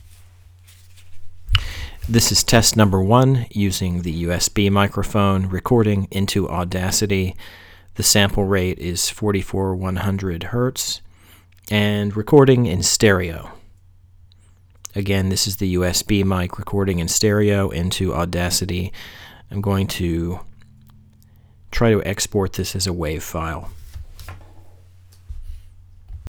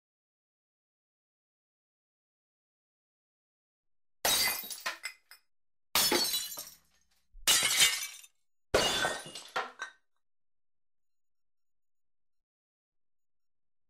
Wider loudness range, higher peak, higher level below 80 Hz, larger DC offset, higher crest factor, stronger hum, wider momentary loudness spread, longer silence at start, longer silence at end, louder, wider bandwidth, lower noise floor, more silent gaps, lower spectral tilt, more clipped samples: second, 7 LU vs 10 LU; first, 0 dBFS vs -12 dBFS; first, -36 dBFS vs -62 dBFS; neither; second, 20 dB vs 26 dB; neither; about the same, 17 LU vs 18 LU; second, 0.05 s vs 4.25 s; second, 0 s vs 4 s; first, -19 LUFS vs -29 LUFS; first, over 20 kHz vs 16 kHz; second, -50 dBFS vs -73 dBFS; neither; first, -4.5 dB/octave vs 0 dB/octave; neither